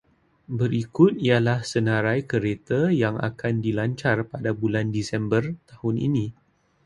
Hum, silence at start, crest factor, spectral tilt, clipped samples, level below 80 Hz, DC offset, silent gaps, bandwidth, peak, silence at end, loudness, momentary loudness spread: none; 0.5 s; 20 dB; -7 dB/octave; under 0.1%; -54 dBFS; under 0.1%; none; 11 kHz; -4 dBFS; 0.55 s; -24 LUFS; 8 LU